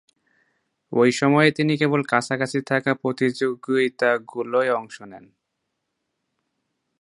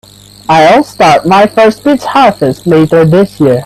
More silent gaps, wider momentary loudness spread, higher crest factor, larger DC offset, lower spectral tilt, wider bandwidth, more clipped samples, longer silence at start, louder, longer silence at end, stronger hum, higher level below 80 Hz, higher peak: neither; first, 9 LU vs 5 LU; first, 22 dB vs 6 dB; neither; about the same, -5.5 dB/octave vs -6 dB/octave; second, 11.5 kHz vs 14 kHz; second, under 0.1% vs 0.4%; first, 0.9 s vs 0.5 s; second, -21 LUFS vs -7 LUFS; first, 1.85 s vs 0 s; neither; second, -70 dBFS vs -42 dBFS; about the same, -2 dBFS vs 0 dBFS